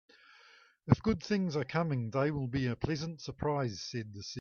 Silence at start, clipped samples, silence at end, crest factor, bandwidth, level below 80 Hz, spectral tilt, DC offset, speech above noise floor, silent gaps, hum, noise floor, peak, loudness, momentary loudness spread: 0.85 s; under 0.1%; 0 s; 24 dB; 7.2 kHz; -56 dBFS; -6.5 dB/octave; under 0.1%; 29 dB; none; none; -62 dBFS; -10 dBFS; -34 LUFS; 10 LU